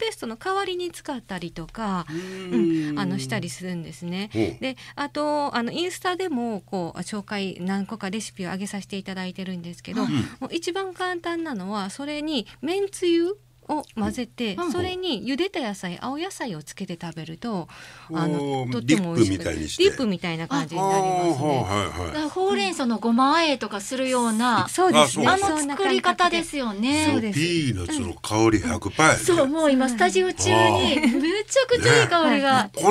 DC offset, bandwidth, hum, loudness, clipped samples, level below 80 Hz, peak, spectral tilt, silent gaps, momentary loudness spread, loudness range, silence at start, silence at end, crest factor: under 0.1%; 15.5 kHz; none; -24 LUFS; under 0.1%; -54 dBFS; 0 dBFS; -4.5 dB/octave; none; 13 LU; 9 LU; 0 s; 0 s; 22 dB